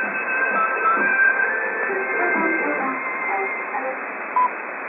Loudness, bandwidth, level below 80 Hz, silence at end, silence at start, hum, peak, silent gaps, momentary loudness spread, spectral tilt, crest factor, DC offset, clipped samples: -20 LUFS; 3.8 kHz; -80 dBFS; 0 s; 0 s; none; -8 dBFS; none; 8 LU; -9 dB/octave; 14 dB; under 0.1%; under 0.1%